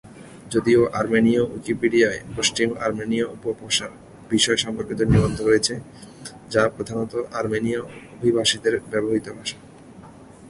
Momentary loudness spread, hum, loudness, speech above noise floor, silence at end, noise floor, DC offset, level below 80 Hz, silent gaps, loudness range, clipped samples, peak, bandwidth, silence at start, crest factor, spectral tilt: 13 LU; none; -22 LUFS; 22 dB; 0 s; -44 dBFS; under 0.1%; -44 dBFS; none; 3 LU; under 0.1%; -4 dBFS; 11.5 kHz; 0.05 s; 20 dB; -4.5 dB/octave